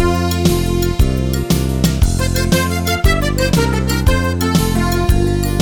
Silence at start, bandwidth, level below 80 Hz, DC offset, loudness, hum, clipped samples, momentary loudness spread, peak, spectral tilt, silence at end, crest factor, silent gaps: 0 s; over 20 kHz; -20 dBFS; under 0.1%; -15 LUFS; none; under 0.1%; 2 LU; 0 dBFS; -5.5 dB/octave; 0 s; 14 dB; none